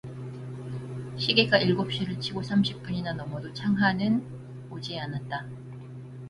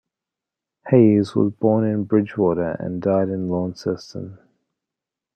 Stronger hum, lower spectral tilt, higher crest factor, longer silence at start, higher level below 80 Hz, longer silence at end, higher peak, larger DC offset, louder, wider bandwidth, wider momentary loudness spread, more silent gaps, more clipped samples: neither; second, -6.5 dB/octave vs -9 dB/octave; about the same, 22 dB vs 18 dB; second, 0.05 s vs 0.85 s; about the same, -58 dBFS vs -60 dBFS; second, 0 s vs 1 s; second, -6 dBFS vs -2 dBFS; neither; second, -27 LUFS vs -20 LUFS; first, 11 kHz vs 9 kHz; first, 19 LU vs 13 LU; neither; neither